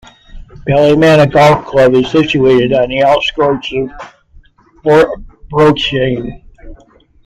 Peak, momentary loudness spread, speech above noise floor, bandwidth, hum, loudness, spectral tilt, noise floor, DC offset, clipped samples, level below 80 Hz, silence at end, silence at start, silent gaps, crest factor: 0 dBFS; 12 LU; 36 dB; 13.5 kHz; none; -10 LUFS; -6.5 dB/octave; -46 dBFS; under 0.1%; under 0.1%; -36 dBFS; 0.5 s; 0.35 s; none; 12 dB